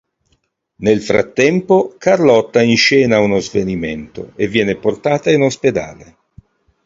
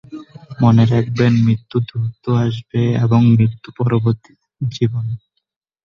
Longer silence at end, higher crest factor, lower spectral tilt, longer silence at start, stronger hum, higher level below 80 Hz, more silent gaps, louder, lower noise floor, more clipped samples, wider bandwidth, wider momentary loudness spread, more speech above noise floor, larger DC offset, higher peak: about the same, 0.8 s vs 0.7 s; about the same, 14 dB vs 14 dB; second, -5 dB/octave vs -8.5 dB/octave; first, 0.8 s vs 0.1 s; neither; about the same, -46 dBFS vs -48 dBFS; neither; first, -14 LUFS vs -17 LUFS; second, -64 dBFS vs -73 dBFS; neither; first, 7.8 kHz vs 6.8 kHz; about the same, 11 LU vs 13 LU; second, 50 dB vs 58 dB; neither; about the same, 0 dBFS vs -2 dBFS